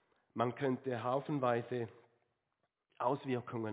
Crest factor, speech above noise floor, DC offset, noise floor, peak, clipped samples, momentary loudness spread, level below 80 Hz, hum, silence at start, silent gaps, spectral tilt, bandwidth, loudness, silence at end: 20 dB; 48 dB; under 0.1%; -85 dBFS; -18 dBFS; under 0.1%; 7 LU; -82 dBFS; none; 0.35 s; none; -6 dB/octave; 4 kHz; -38 LUFS; 0 s